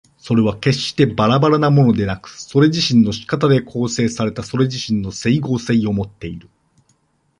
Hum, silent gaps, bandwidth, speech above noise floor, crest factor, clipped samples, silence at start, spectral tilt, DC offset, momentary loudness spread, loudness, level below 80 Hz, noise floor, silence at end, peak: none; none; 11 kHz; 45 dB; 16 dB; under 0.1%; 0.25 s; -6 dB/octave; under 0.1%; 10 LU; -17 LUFS; -46 dBFS; -61 dBFS; 1 s; -2 dBFS